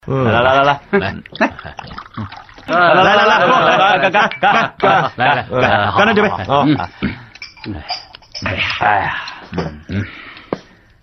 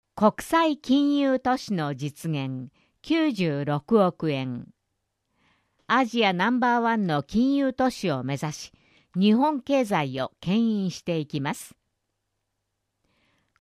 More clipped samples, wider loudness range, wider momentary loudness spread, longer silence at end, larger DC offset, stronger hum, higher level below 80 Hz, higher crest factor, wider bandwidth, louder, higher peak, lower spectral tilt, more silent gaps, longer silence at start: neither; first, 9 LU vs 4 LU; first, 19 LU vs 11 LU; second, 0.4 s vs 1.95 s; neither; neither; first, -44 dBFS vs -60 dBFS; about the same, 14 dB vs 18 dB; second, 6.4 kHz vs 14.5 kHz; first, -14 LUFS vs -25 LUFS; first, 0 dBFS vs -8 dBFS; about the same, -5.5 dB/octave vs -6 dB/octave; neither; about the same, 0.05 s vs 0.15 s